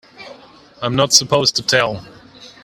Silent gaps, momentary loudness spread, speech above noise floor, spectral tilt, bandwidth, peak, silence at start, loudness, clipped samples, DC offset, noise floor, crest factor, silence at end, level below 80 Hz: none; 13 LU; 28 dB; -2.5 dB/octave; 15.5 kHz; 0 dBFS; 0.2 s; -15 LUFS; under 0.1%; under 0.1%; -44 dBFS; 18 dB; 0.15 s; -52 dBFS